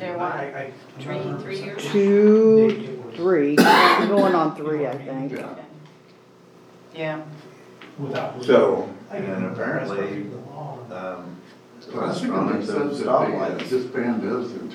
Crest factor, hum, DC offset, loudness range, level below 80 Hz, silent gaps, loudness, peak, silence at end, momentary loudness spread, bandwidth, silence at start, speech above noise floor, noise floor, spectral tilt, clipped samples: 20 dB; none; under 0.1%; 13 LU; -76 dBFS; none; -21 LUFS; -2 dBFS; 0 s; 20 LU; 19 kHz; 0 s; 29 dB; -50 dBFS; -6 dB/octave; under 0.1%